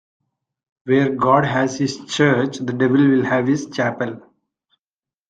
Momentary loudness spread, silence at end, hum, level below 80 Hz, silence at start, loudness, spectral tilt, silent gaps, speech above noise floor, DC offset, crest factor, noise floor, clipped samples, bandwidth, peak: 10 LU; 1.1 s; none; -60 dBFS; 0.85 s; -18 LUFS; -6 dB/octave; none; over 72 dB; under 0.1%; 18 dB; under -90 dBFS; under 0.1%; 9 kHz; -2 dBFS